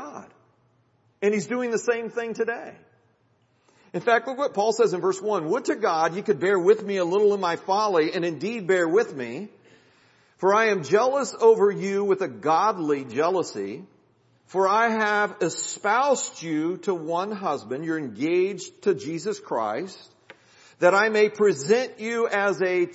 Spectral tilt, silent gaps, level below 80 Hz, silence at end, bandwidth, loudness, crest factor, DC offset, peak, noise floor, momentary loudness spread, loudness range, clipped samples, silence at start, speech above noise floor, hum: -4.5 dB/octave; none; -80 dBFS; 0 s; 8 kHz; -24 LUFS; 20 dB; under 0.1%; -4 dBFS; -65 dBFS; 9 LU; 5 LU; under 0.1%; 0 s; 42 dB; none